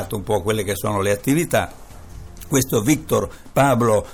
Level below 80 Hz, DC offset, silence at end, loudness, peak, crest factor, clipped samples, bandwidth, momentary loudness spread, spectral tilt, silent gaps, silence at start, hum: -42 dBFS; 0.4%; 0 s; -20 LUFS; -4 dBFS; 18 dB; under 0.1%; 19 kHz; 10 LU; -5 dB/octave; none; 0 s; none